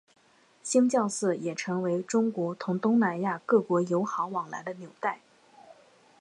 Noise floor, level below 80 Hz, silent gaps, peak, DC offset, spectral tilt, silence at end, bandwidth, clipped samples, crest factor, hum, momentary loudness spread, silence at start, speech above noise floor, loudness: -57 dBFS; -80 dBFS; none; -10 dBFS; under 0.1%; -5.5 dB/octave; 0.5 s; 11.5 kHz; under 0.1%; 18 dB; none; 10 LU; 0.65 s; 29 dB; -28 LUFS